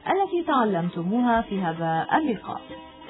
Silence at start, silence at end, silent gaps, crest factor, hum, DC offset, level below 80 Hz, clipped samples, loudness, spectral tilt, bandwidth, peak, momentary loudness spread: 0 s; 0 s; none; 16 dB; none; under 0.1%; -54 dBFS; under 0.1%; -24 LUFS; -10.5 dB/octave; 4.1 kHz; -8 dBFS; 11 LU